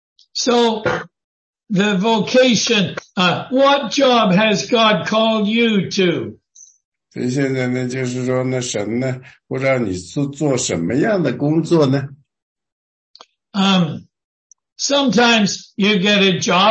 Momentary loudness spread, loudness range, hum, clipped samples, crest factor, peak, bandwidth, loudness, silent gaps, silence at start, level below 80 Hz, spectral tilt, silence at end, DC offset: 10 LU; 6 LU; none; under 0.1%; 14 dB; -2 dBFS; 8.6 kHz; -16 LUFS; 1.24-1.53 s, 6.85-6.92 s, 12.42-12.56 s, 12.72-13.14 s, 14.24-14.50 s, 14.72-14.76 s; 0.35 s; -58 dBFS; -4.5 dB/octave; 0 s; under 0.1%